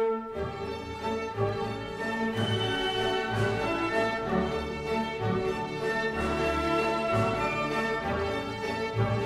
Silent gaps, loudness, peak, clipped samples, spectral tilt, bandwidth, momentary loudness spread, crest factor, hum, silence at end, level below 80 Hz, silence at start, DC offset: none; -29 LUFS; -14 dBFS; under 0.1%; -5.5 dB/octave; 15 kHz; 6 LU; 14 dB; none; 0 s; -48 dBFS; 0 s; under 0.1%